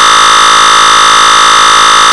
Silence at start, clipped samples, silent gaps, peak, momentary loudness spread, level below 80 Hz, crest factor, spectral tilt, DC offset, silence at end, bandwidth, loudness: 0 s; 6%; none; 0 dBFS; 0 LU; -38 dBFS; 4 dB; 1 dB/octave; 3%; 0 s; over 20 kHz; -2 LUFS